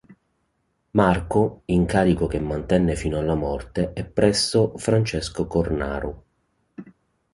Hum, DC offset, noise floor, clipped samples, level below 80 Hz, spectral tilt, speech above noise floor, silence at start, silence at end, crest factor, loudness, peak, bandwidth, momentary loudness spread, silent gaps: none; under 0.1%; -71 dBFS; under 0.1%; -38 dBFS; -6 dB/octave; 50 dB; 0.1 s; 0.45 s; 20 dB; -22 LUFS; -2 dBFS; 11.5 kHz; 7 LU; none